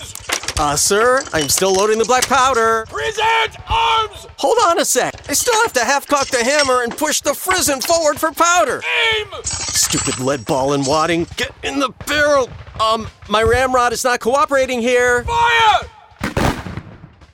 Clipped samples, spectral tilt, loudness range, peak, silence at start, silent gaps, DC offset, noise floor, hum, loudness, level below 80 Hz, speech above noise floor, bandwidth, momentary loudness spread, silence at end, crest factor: under 0.1%; -2.5 dB/octave; 2 LU; -2 dBFS; 0 s; none; under 0.1%; -40 dBFS; none; -15 LUFS; -38 dBFS; 24 dB; 16.5 kHz; 8 LU; 0.25 s; 14 dB